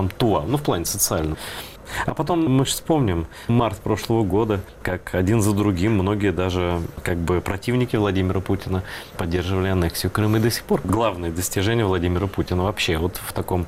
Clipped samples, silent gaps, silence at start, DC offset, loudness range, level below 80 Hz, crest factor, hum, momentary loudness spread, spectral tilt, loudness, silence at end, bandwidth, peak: under 0.1%; none; 0 s; under 0.1%; 2 LU; -38 dBFS; 14 dB; none; 7 LU; -5.5 dB/octave; -22 LUFS; 0 s; 16 kHz; -8 dBFS